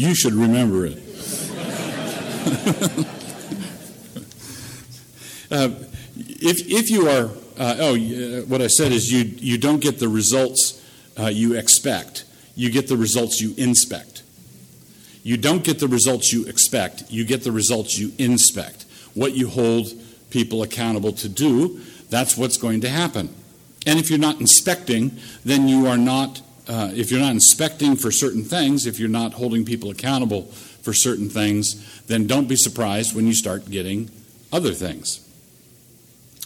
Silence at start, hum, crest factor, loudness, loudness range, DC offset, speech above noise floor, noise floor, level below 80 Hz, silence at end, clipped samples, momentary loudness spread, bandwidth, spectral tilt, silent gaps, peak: 0 s; none; 20 dB; -19 LUFS; 8 LU; under 0.1%; 31 dB; -50 dBFS; -56 dBFS; 0 s; under 0.1%; 18 LU; 19 kHz; -3.5 dB/octave; none; 0 dBFS